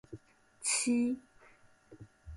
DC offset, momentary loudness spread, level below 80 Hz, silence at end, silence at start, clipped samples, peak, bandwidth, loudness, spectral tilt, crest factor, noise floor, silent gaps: under 0.1%; 24 LU; -62 dBFS; 0 s; 0.1 s; under 0.1%; -20 dBFS; 11.5 kHz; -32 LUFS; -2.5 dB/octave; 18 dB; -62 dBFS; none